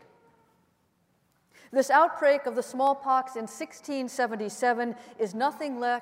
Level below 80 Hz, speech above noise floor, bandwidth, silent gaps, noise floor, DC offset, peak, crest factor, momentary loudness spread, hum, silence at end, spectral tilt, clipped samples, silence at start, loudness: -84 dBFS; 43 dB; 16 kHz; none; -70 dBFS; under 0.1%; -8 dBFS; 20 dB; 12 LU; none; 0 s; -3.5 dB/octave; under 0.1%; 1.7 s; -27 LUFS